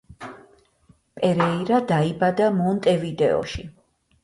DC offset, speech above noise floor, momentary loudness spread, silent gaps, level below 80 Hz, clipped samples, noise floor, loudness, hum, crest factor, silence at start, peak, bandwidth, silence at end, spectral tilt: under 0.1%; 38 dB; 20 LU; none; -50 dBFS; under 0.1%; -59 dBFS; -22 LUFS; none; 18 dB; 0.1 s; -6 dBFS; 11.5 kHz; 0.55 s; -7 dB/octave